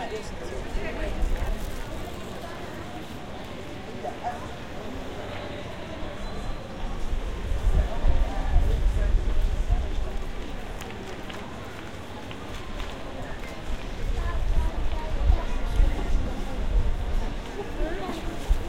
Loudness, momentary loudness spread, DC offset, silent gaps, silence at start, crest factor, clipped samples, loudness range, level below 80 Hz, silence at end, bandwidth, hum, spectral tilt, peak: -32 LUFS; 10 LU; 0.9%; none; 0 s; 18 dB; under 0.1%; 8 LU; -28 dBFS; 0 s; 12 kHz; none; -6 dB/octave; -8 dBFS